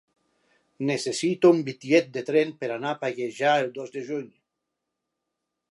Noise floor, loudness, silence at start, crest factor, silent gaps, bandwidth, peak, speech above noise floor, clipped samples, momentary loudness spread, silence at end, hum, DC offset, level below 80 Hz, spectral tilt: -83 dBFS; -25 LUFS; 0.8 s; 20 dB; none; 11.5 kHz; -6 dBFS; 58 dB; under 0.1%; 12 LU; 1.45 s; none; under 0.1%; -80 dBFS; -5 dB/octave